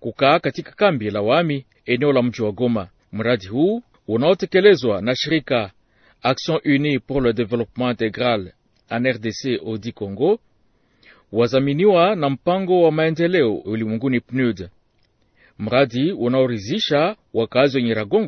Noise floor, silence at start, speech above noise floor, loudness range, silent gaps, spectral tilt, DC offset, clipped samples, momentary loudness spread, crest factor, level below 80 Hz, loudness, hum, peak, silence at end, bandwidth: -62 dBFS; 0 s; 43 dB; 4 LU; none; -6.5 dB/octave; under 0.1%; under 0.1%; 9 LU; 20 dB; -52 dBFS; -20 LUFS; none; 0 dBFS; 0 s; 6.6 kHz